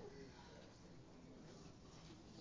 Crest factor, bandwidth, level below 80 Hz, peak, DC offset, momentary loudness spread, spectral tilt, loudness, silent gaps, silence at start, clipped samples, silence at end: 14 dB; 8 kHz; -70 dBFS; -44 dBFS; under 0.1%; 3 LU; -5 dB/octave; -61 LUFS; none; 0 s; under 0.1%; 0 s